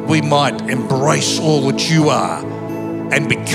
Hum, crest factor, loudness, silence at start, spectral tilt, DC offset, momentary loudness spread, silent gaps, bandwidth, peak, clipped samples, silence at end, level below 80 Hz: none; 16 dB; -16 LUFS; 0 s; -4.5 dB/octave; under 0.1%; 10 LU; none; 14.5 kHz; 0 dBFS; under 0.1%; 0 s; -56 dBFS